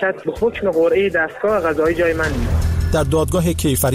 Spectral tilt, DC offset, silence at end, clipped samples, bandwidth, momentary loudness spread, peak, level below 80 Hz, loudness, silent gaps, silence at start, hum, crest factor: -5.5 dB/octave; under 0.1%; 0 s; under 0.1%; 16 kHz; 4 LU; -6 dBFS; -26 dBFS; -18 LUFS; none; 0 s; none; 10 dB